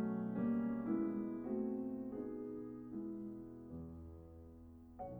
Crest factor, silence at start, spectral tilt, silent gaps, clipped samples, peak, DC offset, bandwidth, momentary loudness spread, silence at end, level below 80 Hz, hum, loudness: 16 dB; 0 s; -11 dB/octave; none; under 0.1%; -28 dBFS; under 0.1%; 3 kHz; 18 LU; 0 s; -66 dBFS; none; -43 LUFS